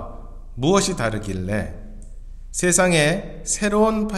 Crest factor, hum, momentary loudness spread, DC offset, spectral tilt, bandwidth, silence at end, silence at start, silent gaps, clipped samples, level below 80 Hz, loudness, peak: 18 dB; none; 17 LU; under 0.1%; -4 dB/octave; 14 kHz; 0 s; 0 s; none; under 0.1%; -36 dBFS; -20 LUFS; -4 dBFS